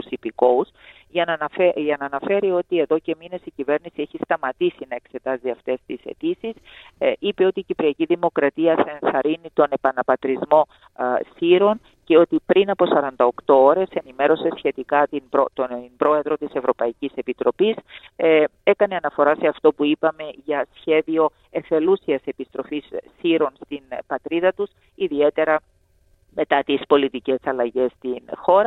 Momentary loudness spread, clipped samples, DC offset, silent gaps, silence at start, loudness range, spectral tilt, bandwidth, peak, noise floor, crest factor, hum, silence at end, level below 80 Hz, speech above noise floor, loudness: 12 LU; under 0.1%; under 0.1%; none; 0 s; 6 LU; -8 dB/octave; 4.1 kHz; -2 dBFS; -59 dBFS; 18 dB; none; 0 s; -62 dBFS; 39 dB; -21 LUFS